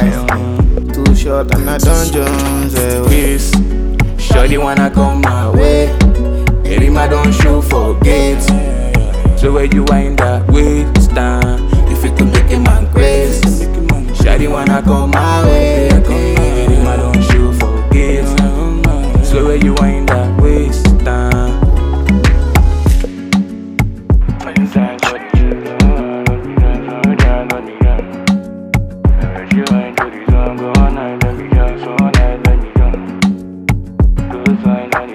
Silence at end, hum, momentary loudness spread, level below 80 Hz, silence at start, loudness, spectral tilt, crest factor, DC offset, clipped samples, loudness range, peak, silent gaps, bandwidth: 0 s; none; 5 LU; -12 dBFS; 0 s; -12 LUFS; -6.5 dB/octave; 10 dB; under 0.1%; under 0.1%; 3 LU; 0 dBFS; none; 16 kHz